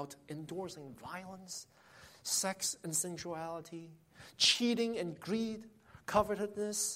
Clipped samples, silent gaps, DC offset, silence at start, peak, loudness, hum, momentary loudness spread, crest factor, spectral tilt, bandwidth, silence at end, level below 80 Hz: under 0.1%; none; under 0.1%; 0 s; -14 dBFS; -35 LUFS; none; 18 LU; 24 dB; -2.5 dB/octave; 16 kHz; 0 s; -68 dBFS